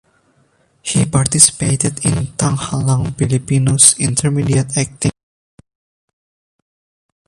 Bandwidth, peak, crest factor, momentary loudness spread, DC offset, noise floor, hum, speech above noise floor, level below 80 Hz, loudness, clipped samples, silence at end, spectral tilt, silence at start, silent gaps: 16 kHz; 0 dBFS; 16 dB; 10 LU; under 0.1%; -57 dBFS; none; 43 dB; -40 dBFS; -14 LUFS; 0.1%; 2.15 s; -4 dB/octave; 0.85 s; none